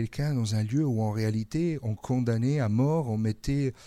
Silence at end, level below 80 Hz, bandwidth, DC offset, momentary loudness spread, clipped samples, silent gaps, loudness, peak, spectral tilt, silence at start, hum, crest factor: 0 s; -48 dBFS; 13 kHz; under 0.1%; 4 LU; under 0.1%; none; -28 LUFS; -14 dBFS; -7.5 dB/octave; 0 s; none; 12 dB